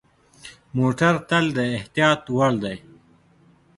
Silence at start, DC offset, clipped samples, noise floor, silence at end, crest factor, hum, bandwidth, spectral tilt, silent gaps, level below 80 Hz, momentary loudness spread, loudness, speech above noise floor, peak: 0.45 s; under 0.1%; under 0.1%; -56 dBFS; 1 s; 20 dB; none; 11.5 kHz; -6 dB/octave; none; -56 dBFS; 16 LU; -21 LUFS; 35 dB; -4 dBFS